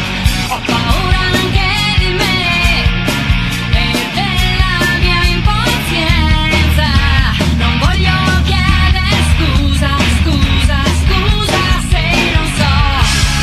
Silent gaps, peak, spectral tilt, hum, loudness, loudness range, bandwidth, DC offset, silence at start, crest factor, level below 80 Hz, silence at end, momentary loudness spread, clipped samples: none; 0 dBFS; -4.5 dB/octave; none; -12 LUFS; 1 LU; 14 kHz; under 0.1%; 0 s; 12 dB; -16 dBFS; 0 s; 3 LU; under 0.1%